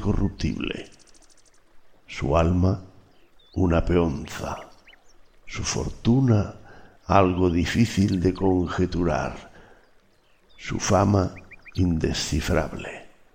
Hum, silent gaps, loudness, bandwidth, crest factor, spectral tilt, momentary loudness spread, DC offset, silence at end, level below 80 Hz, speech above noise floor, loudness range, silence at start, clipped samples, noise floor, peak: none; none; -24 LUFS; 16 kHz; 20 dB; -6 dB/octave; 16 LU; under 0.1%; 0.25 s; -38 dBFS; 36 dB; 5 LU; 0 s; under 0.1%; -59 dBFS; -4 dBFS